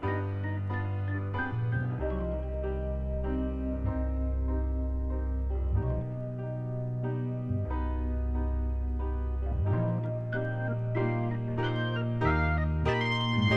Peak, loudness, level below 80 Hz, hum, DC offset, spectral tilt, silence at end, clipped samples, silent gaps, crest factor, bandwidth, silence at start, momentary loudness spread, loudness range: -14 dBFS; -32 LUFS; -34 dBFS; none; under 0.1%; -8.5 dB/octave; 0 s; under 0.1%; none; 16 dB; 6.6 kHz; 0 s; 6 LU; 3 LU